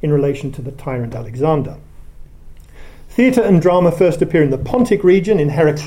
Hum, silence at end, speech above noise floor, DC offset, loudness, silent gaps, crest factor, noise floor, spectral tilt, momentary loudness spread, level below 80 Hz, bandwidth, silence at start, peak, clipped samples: none; 0 s; 22 dB; under 0.1%; -15 LUFS; none; 14 dB; -36 dBFS; -8 dB/octave; 12 LU; -36 dBFS; 16.5 kHz; 0.05 s; 0 dBFS; under 0.1%